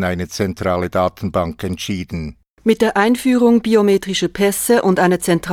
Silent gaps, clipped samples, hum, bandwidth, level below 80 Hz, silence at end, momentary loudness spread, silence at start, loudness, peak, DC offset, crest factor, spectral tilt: 2.50-2.57 s; under 0.1%; none; 17.5 kHz; -42 dBFS; 0 s; 10 LU; 0 s; -16 LUFS; -2 dBFS; under 0.1%; 14 dB; -5 dB/octave